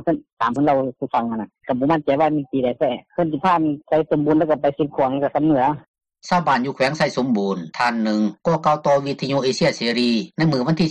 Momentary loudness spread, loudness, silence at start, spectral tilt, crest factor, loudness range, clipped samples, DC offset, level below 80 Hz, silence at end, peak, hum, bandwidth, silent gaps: 5 LU; -20 LUFS; 0 s; -6 dB/octave; 12 dB; 1 LU; under 0.1%; under 0.1%; -56 dBFS; 0 s; -8 dBFS; none; 10 kHz; 0.32-0.37 s, 5.88-5.94 s